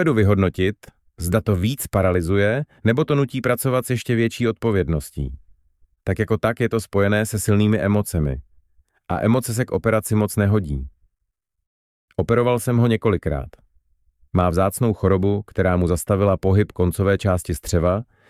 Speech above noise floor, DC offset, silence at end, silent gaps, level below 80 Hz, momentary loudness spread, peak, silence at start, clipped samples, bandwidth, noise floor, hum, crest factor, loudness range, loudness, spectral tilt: 58 dB; under 0.1%; 0.25 s; 11.67-12.08 s; -38 dBFS; 9 LU; -2 dBFS; 0 s; under 0.1%; 15 kHz; -77 dBFS; none; 18 dB; 3 LU; -20 LUFS; -6.5 dB/octave